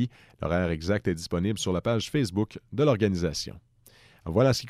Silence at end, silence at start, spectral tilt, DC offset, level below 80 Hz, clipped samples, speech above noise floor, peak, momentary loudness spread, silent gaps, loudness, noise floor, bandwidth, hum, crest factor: 0 s; 0 s; -6 dB/octave; under 0.1%; -48 dBFS; under 0.1%; 30 dB; -10 dBFS; 10 LU; none; -27 LUFS; -57 dBFS; 15 kHz; none; 18 dB